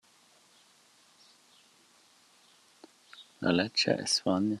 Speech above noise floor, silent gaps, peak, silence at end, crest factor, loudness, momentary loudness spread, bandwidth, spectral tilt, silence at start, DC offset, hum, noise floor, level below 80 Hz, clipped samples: 35 dB; none; -12 dBFS; 0 s; 22 dB; -28 LUFS; 25 LU; 13 kHz; -3.5 dB/octave; 3.15 s; under 0.1%; none; -63 dBFS; -78 dBFS; under 0.1%